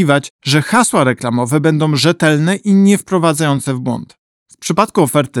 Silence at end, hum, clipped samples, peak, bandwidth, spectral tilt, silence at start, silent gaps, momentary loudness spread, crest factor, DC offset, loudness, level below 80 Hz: 0 s; none; under 0.1%; 0 dBFS; 16.5 kHz; -5 dB/octave; 0 s; 0.30-0.39 s, 4.19-4.46 s; 7 LU; 12 dB; under 0.1%; -13 LUFS; -56 dBFS